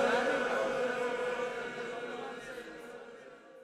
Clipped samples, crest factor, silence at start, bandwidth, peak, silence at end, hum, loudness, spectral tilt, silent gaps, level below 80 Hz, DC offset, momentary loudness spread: under 0.1%; 18 dB; 0 s; 13.5 kHz; -18 dBFS; 0 s; none; -35 LUFS; -3.5 dB/octave; none; -70 dBFS; under 0.1%; 18 LU